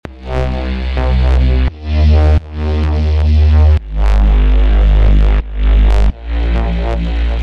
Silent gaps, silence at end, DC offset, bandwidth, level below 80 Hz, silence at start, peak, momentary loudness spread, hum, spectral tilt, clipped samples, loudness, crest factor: none; 0 s; under 0.1%; 5.6 kHz; -10 dBFS; 0.05 s; 0 dBFS; 8 LU; none; -8.5 dB/octave; under 0.1%; -14 LUFS; 10 dB